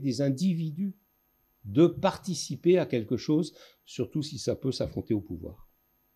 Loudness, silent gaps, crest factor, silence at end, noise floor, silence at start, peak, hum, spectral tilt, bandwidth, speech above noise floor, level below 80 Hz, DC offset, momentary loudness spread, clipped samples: -29 LUFS; none; 18 dB; 0.55 s; -70 dBFS; 0 s; -10 dBFS; none; -6.5 dB/octave; 13.5 kHz; 42 dB; -60 dBFS; under 0.1%; 13 LU; under 0.1%